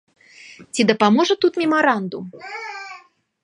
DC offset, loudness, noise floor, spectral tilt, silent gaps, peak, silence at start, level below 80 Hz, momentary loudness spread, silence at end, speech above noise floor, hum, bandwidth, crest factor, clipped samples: under 0.1%; -18 LUFS; -47 dBFS; -4.5 dB/octave; none; -2 dBFS; 0.45 s; -70 dBFS; 17 LU; 0.45 s; 29 dB; none; 11 kHz; 20 dB; under 0.1%